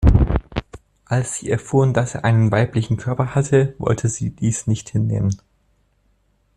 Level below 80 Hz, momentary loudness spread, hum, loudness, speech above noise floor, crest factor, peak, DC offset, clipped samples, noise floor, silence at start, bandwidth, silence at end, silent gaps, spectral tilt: -28 dBFS; 7 LU; none; -20 LUFS; 43 dB; 16 dB; -2 dBFS; under 0.1%; under 0.1%; -62 dBFS; 0 s; 11 kHz; 1.2 s; none; -6.5 dB/octave